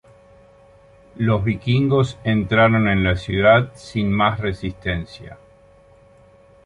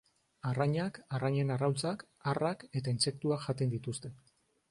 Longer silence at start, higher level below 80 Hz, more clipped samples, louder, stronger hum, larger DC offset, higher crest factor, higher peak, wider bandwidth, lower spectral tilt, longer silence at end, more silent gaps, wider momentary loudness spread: first, 1.15 s vs 0.45 s; first, -40 dBFS vs -68 dBFS; neither; first, -19 LUFS vs -34 LUFS; neither; neither; about the same, 18 dB vs 18 dB; first, -2 dBFS vs -18 dBFS; about the same, 10.5 kHz vs 11.5 kHz; first, -7.5 dB/octave vs -5.5 dB/octave; first, 1.3 s vs 0.55 s; neither; first, 12 LU vs 7 LU